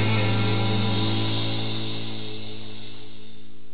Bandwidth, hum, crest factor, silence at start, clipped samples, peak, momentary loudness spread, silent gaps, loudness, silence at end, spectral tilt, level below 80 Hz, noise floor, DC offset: 4 kHz; none; 14 dB; 0 s; under 0.1%; -10 dBFS; 20 LU; none; -25 LUFS; 0.15 s; -10 dB/octave; -56 dBFS; -48 dBFS; 5%